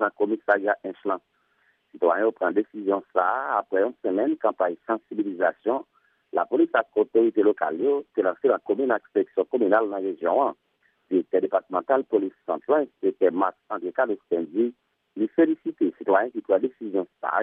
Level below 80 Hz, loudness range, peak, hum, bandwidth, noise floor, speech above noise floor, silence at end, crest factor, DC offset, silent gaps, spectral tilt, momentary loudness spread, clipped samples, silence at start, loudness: -82 dBFS; 2 LU; -6 dBFS; none; 3.7 kHz; -67 dBFS; 43 dB; 0 s; 18 dB; under 0.1%; none; -9 dB/octave; 7 LU; under 0.1%; 0 s; -25 LUFS